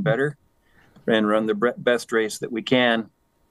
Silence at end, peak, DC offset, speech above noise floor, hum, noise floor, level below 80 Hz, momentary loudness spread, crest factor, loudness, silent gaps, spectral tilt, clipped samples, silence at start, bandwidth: 0.45 s; -4 dBFS; under 0.1%; 37 dB; none; -58 dBFS; -68 dBFS; 9 LU; 18 dB; -22 LUFS; none; -5 dB/octave; under 0.1%; 0 s; 12.5 kHz